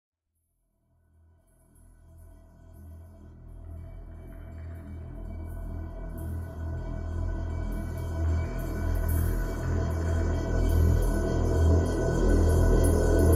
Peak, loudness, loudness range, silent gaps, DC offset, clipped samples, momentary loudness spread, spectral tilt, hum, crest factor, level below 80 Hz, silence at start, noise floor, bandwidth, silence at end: -10 dBFS; -28 LUFS; 21 LU; none; under 0.1%; under 0.1%; 21 LU; -7.5 dB/octave; none; 18 dB; -32 dBFS; 2.15 s; -77 dBFS; 15.5 kHz; 0 s